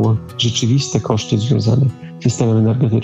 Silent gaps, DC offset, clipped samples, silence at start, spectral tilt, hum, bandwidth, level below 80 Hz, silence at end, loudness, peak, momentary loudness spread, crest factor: none; under 0.1%; under 0.1%; 0 s; -6 dB/octave; none; 8.2 kHz; -50 dBFS; 0 s; -16 LUFS; -2 dBFS; 4 LU; 12 dB